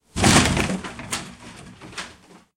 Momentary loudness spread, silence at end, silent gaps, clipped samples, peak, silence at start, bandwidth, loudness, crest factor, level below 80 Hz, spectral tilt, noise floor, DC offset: 25 LU; 0.45 s; none; under 0.1%; -2 dBFS; 0.15 s; 17 kHz; -20 LUFS; 22 dB; -38 dBFS; -3.5 dB/octave; -48 dBFS; under 0.1%